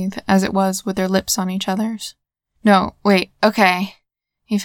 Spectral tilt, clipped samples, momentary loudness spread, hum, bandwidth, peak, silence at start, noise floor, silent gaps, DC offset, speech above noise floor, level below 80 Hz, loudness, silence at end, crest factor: -4.5 dB/octave; under 0.1%; 9 LU; none; 18 kHz; 0 dBFS; 0 s; -64 dBFS; none; under 0.1%; 46 dB; -50 dBFS; -18 LUFS; 0 s; 18 dB